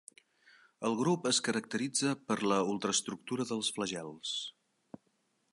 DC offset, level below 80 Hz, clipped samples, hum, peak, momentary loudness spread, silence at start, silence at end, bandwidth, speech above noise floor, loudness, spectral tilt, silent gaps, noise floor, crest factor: under 0.1%; -78 dBFS; under 0.1%; none; -18 dBFS; 8 LU; 0.8 s; 1 s; 11.5 kHz; 43 dB; -33 LUFS; -3.5 dB/octave; none; -76 dBFS; 18 dB